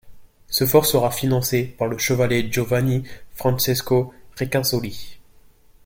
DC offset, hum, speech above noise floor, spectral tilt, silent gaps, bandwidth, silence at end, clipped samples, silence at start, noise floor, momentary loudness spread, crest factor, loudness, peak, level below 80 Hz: under 0.1%; none; 30 dB; -4.5 dB/octave; none; 17 kHz; 0.65 s; under 0.1%; 0.05 s; -50 dBFS; 11 LU; 20 dB; -21 LUFS; -2 dBFS; -46 dBFS